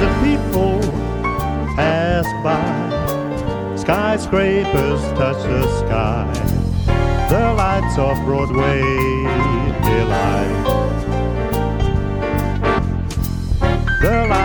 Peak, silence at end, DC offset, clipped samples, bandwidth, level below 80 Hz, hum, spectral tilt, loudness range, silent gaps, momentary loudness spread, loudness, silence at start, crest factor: -2 dBFS; 0 s; under 0.1%; under 0.1%; over 20 kHz; -24 dBFS; none; -7 dB/octave; 2 LU; none; 5 LU; -18 LUFS; 0 s; 16 dB